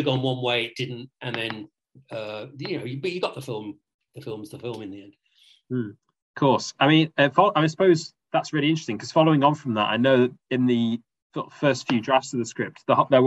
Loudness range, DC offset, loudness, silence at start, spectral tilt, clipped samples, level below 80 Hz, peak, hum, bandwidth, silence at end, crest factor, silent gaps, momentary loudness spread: 12 LU; under 0.1%; -23 LUFS; 0 s; -6 dB/octave; under 0.1%; -70 dBFS; -4 dBFS; none; 12 kHz; 0 s; 20 dB; 3.94-3.99 s, 6.22-6.34 s, 11.22-11.30 s; 17 LU